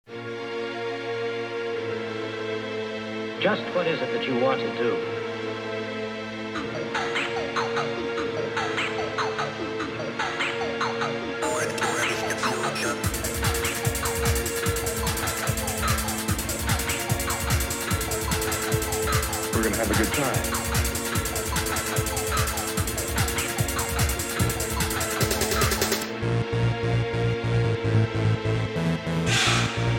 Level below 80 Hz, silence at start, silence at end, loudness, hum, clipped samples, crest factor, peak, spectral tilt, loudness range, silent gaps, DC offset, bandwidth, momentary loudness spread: -38 dBFS; 0.1 s; 0 s; -26 LUFS; none; under 0.1%; 18 dB; -8 dBFS; -4 dB/octave; 3 LU; none; under 0.1%; 17 kHz; 7 LU